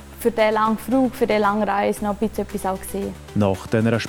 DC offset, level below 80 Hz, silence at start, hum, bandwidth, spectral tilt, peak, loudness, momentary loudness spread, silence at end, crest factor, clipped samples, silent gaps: under 0.1%; -44 dBFS; 0 s; none; 18 kHz; -6 dB/octave; -4 dBFS; -21 LUFS; 8 LU; 0 s; 16 dB; under 0.1%; none